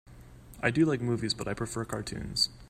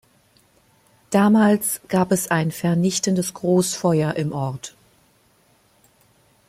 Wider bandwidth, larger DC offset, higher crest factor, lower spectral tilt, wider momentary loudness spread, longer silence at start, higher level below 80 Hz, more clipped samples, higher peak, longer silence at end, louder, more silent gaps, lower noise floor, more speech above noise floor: about the same, 15 kHz vs 16 kHz; neither; about the same, 20 dB vs 18 dB; about the same, -4.5 dB/octave vs -5.5 dB/octave; about the same, 8 LU vs 10 LU; second, 0.05 s vs 1.1 s; first, -52 dBFS vs -60 dBFS; neither; second, -12 dBFS vs -4 dBFS; second, 0.05 s vs 1.8 s; second, -30 LUFS vs -20 LUFS; neither; second, -50 dBFS vs -59 dBFS; second, 20 dB vs 40 dB